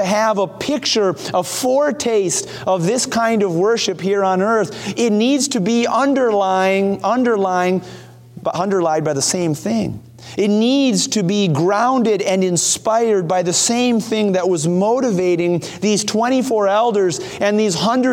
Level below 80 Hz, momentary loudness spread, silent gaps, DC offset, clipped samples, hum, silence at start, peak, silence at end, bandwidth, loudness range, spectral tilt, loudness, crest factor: -58 dBFS; 5 LU; none; under 0.1%; under 0.1%; none; 0 s; -4 dBFS; 0 s; 17 kHz; 2 LU; -4 dB/octave; -17 LUFS; 14 dB